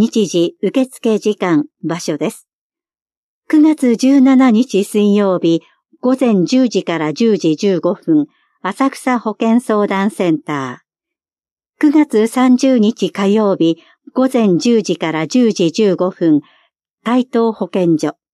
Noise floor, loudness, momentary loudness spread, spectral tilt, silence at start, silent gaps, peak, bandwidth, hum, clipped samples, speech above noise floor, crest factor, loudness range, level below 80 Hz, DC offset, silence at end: under -90 dBFS; -14 LUFS; 8 LU; -6 dB/octave; 0 s; 2.53-2.70 s, 3.02-3.06 s, 3.17-3.42 s, 11.52-11.56 s, 16.93-16.97 s; -2 dBFS; 12.5 kHz; none; under 0.1%; over 77 dB; 12 dB; 4 LU; -70 dBFS; under 0.1%; 0.2 s